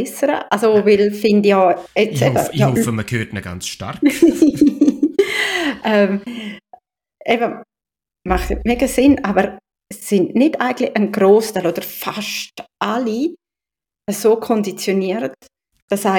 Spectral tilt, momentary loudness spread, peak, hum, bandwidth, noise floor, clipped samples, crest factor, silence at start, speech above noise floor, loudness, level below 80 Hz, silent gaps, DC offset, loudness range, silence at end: -5.5 dB/octave; 13 LU; -2 dBFS; none; 17.5 kHz; -89 dBFS; under 0.1%; 16 dB; 0 s; 73 dB; -17 LUFS; -38 dBFS; 15.82-15.88 s; under 0.1%; 5 LU; 0 s